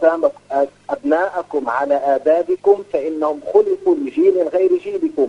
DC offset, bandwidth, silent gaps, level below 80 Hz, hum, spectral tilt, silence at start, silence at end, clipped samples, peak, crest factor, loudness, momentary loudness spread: under 0.1%; 8.6 kHz; none; -62 dBFS; 50 Hz at -60 dBFS; -6.5 dB/octave; 0 s; 0 s; under 0.1%; -2 dBFS; 16 dB; -17 LUFS; 6 LU